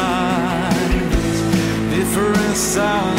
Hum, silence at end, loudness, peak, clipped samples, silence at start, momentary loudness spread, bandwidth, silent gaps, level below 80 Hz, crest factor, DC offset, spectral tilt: none; 0 s; -18 LUFS; -6 dBFS; under 0.1%; 0 s; 2 LU; 16.5 kHz; none; -28 dBFS; 12 dB; under 0.1%; -4.5 dB/octave